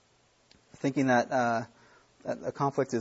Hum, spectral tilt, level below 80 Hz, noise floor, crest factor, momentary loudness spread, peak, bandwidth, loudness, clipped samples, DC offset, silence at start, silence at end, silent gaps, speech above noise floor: none; -6 dB/octave; -72 dBFS; -66 dBFS; 20 dB; 13 LU; -12 dBFS; 8 kHz; -29 LUFS; under 0.1%; under 0.1%; 0.85 s; 0 s; none; 38 dB